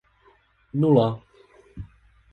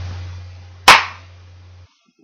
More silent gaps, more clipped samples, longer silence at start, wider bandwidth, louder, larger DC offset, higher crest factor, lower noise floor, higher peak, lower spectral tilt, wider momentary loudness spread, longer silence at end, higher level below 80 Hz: neither; second, under 0.1% vs 0.2%; first, 0.75 s vs 0 s; second, 4.8 kHz vs 15.5 kHz; second, -22 LUFS vs -11 LUFS; neither; about the same, 20 dB vs 18 dB; first, -60 dBFS vs -47 dBFS; second, -6 dBFS vs 0 dBFS; first, -10.5 dB/octave vs -1.5 dB/octave; about the same, 24 LU vs 24 LU; second, 0.45 s vs 1.1 s; second, -52 dBFS vs -46 dBFS